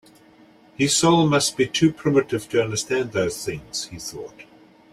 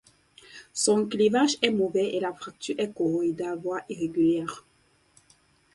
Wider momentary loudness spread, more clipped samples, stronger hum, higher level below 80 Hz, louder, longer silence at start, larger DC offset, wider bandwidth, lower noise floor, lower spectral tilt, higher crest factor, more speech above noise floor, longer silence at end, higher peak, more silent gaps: about the same, 15 LU vs 14 LU; neither; neither; first, -56 dBFS vs -68 dBFS; first, -21 LUFS vs -26 LUFS; first, 0.8 s vs 0.55 s; neither; first, 15.5 kHz vs 11.5 kHz; second, -52 dBFS vs -63 dBFS; about the same, -4 dB/octave vs -4 dB/octave; about the same, 18 dB vs 22 dB; second, 30 dB vs 37 dB; second, 0.5 s vs 1.15 s; about the same, -6 dBFS vs -6 dBFS; neither